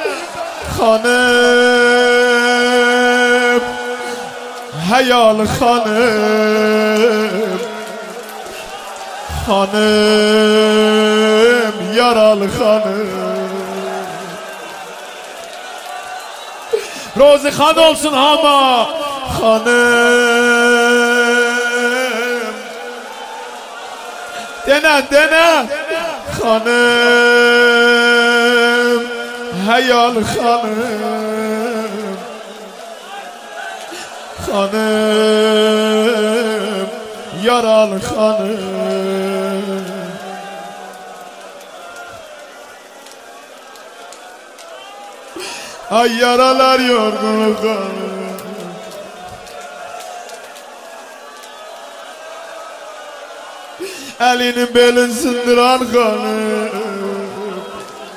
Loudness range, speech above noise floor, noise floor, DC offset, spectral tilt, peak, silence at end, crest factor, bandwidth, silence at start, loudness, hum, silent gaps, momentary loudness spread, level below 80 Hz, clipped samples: 20 LU; 25 dB; -37 dBFS; under 0.1%; -3.5 dB/octave; 0 dBFS; 0 s; 14 dB; 16 kHz; 0 s; -13 LUFS; none; none; 21 LU; -46 dBFS; under 0.1%